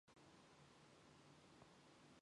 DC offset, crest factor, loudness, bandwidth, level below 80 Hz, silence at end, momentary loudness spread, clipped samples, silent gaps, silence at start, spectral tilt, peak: under 0.1%; 16 dB; -68 LUFS; 11 kHz; -88 dBFS; 0 s; 1 LU; under 0.1%; none; 0.05 s; -4 dB/octave; -52 dBFS